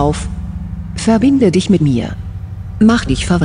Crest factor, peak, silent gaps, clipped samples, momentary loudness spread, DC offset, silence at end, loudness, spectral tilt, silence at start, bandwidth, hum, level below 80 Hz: 14 dB; 0 dBFS; none; under 0.1%; 15 LU; under 0.1%; 0 s; -13 LUFS; -6.5 dB/octave; 0 s; 10.5 kHz; none; -28 dBFS